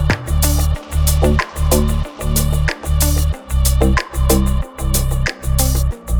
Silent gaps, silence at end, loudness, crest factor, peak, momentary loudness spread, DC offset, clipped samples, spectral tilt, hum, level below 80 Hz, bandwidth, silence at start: none; 0 s; -17 LUFS; 14 dB; -2 dBFS; 5 LU; under 0.1%; under 0.1%; -5 dB/octave; none; -18 dBFS; over 20 kHz; 0 s